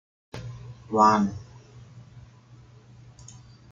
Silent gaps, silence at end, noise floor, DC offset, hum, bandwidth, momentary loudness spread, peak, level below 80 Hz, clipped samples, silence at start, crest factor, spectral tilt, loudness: none; 1.5 s; -51 dBFS; under 0.1%; none; 7.6 kHz; 29 LU; -6 dBFS; -58 dBFS; under 0.1%; 0.35 s; 24 dB; -6 dB/octave; -22 LUFS